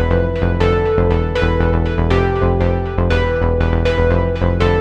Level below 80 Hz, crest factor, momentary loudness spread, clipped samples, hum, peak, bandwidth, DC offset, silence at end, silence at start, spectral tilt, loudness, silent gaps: -22 dBFS; 14 dB; 2 LU; under 0.1%; none; -2 dBFS; 6.8 kHz; under 0.1%; 0 s; 0 s; -8 dB/octave; -16 LUFS; none